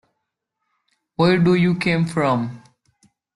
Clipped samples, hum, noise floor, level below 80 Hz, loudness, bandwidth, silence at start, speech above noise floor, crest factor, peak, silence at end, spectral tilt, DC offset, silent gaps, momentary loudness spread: under 0.1%; none; -78 dBFS; -56 dBFS; -18 LUFS; 11.5 kHz; 1.2 s; 60 dB; 16 dB; -6 dBFS; 0.75 s; -7.5 dB/octave; under 0.1%; none; 11 LU